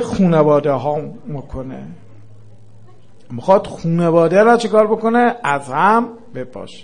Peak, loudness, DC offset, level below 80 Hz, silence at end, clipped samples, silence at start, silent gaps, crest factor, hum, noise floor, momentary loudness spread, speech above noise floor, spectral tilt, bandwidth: 0 dBFS; -15 LUFS; 1%; -46 dBFS; 0.05 s; under 0.1%; 0 s; none; 16 dB; none; -47 dBFS; 18 LU; 32 dB; -7 dB/octave; 10.5 kHz